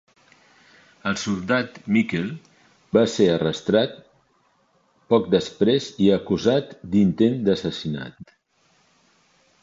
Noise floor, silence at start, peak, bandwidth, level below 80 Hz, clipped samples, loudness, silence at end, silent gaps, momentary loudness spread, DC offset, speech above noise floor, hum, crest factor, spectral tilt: -64 dBFS; 1.05 s; -4 dBFS; 7.8 kHz; -54 dBFS; under 0.1%; -22 LUFS; 1.4 s; none; 10 LU; under 0.1%; 43 dB; none; 20 dB; -6 dB/octave